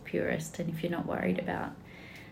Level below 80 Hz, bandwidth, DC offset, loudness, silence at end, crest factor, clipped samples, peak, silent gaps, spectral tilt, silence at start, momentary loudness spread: -60 dBFS; 16 kHz; under 0.1%; -34 LUFS; 0 s; 18 dB; under 0.1%; -18 dBFS; none; -6 dB/octave; 0 s; 16 LU